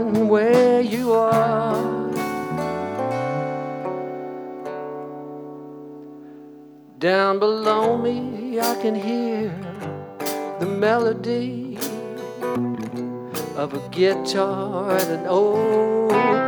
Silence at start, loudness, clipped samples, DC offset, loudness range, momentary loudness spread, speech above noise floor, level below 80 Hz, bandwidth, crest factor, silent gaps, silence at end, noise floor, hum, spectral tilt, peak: 0 s; -22 LUFS; under 0.1%; under 0.1%; 8 LU; 15 LU; 25 dB; -62 dBFS; over 20 kHz; 18 dB; none; 0 s; -44 dBFS; none; -5.5 dB/octave; -4 dBFS